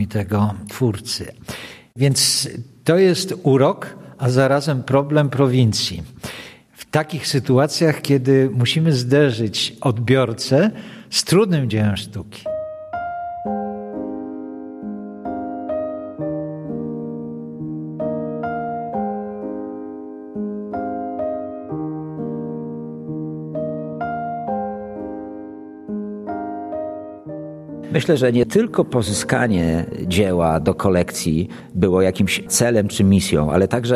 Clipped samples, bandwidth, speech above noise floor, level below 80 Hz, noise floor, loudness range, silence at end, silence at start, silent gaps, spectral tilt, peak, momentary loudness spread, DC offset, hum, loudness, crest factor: under 0.1%; 14.5 kHz; 24 dB; -46 dBFS; -41 dBFS; 10 LU; 0 s; 0 s; none; -5.5 dB/octave; 0 dBFS; 15 LU; under 0.1%; none; -20 LUFS; 20 dB